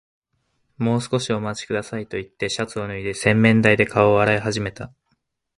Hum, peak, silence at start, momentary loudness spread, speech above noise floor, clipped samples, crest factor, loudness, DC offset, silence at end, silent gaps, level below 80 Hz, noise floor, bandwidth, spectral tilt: none; 0 dBFS; 0.8 s; 13 LU; 51 dB; under 0.1%; 22 dB; -20 LUFS; under 0.1%; 0.7 s; none; -50 dBFS; -71 dBFS; 11.5 kHz; -5.5 dB/octave